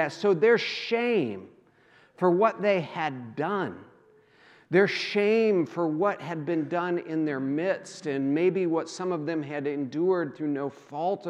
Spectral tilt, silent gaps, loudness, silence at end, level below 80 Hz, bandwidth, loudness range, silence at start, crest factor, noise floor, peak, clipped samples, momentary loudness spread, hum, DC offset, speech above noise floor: -6 dB/octave; none; -27 LUFS; 0 s; -84 dBFS; 10 kHz; 2 LU; 0 s; 18 dB; -59 dBFS; -8 dBFS; under 0.1%; 9 LU; none; under 0.1%; 33 dB